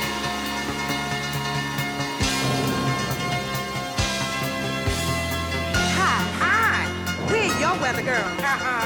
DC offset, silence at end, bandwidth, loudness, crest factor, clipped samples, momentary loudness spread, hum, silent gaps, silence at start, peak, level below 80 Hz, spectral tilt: under 0.1%; 0 s; over 20 kHz; -23 LUFS; 12 dB; under 0.1%; 6 LU; none; none; 0 s; -12 dBFS; -42 dBFS; -3.5 dB/octave